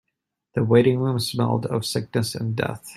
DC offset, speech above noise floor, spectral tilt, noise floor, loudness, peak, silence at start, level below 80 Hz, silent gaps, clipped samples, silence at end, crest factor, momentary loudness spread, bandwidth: under 0.1%; 59 dB; -6 dB/octave; -81 dBFS; -23 LUFS; -4 dBFS; 0.55 s; -58 dBFS; none; under 0.1%; 0 s; 20 dB; 9 LU; 14 kHz